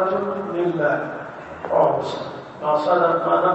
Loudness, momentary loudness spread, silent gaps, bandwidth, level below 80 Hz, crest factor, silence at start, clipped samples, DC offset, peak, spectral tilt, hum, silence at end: -21 LUFS; 15 LU; none; 8.2 kHz; -62 dBFS; 16 dB; 0 s; under 0.1%; under 0.1%; -6 dBFS; -7 dB/octave; none; 0 s